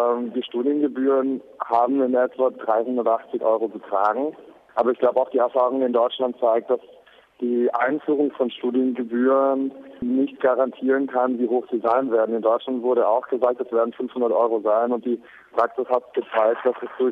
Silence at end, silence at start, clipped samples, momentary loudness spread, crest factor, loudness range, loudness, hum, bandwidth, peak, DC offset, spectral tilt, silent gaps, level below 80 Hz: 0 s; 0 s; under 0.1%; 6 LU; 14 dB; 1 LU; -22 LUFS; none; 4.7 kHz; -6 dBFS; under 0.1%; -7.5 dB/octave; none; -70 dBFS